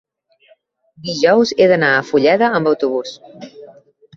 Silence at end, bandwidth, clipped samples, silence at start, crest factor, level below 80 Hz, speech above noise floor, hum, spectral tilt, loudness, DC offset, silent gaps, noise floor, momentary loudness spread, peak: 0.5 s; 7.4 kHz; under 0.1%; 1.05 s; 16 dB; -60 dBFS; 40 dB; none; -5 dB/octave; -14 LUFS; under 0.1%; none; -55 dBFS; 21 LU; -2 dBFS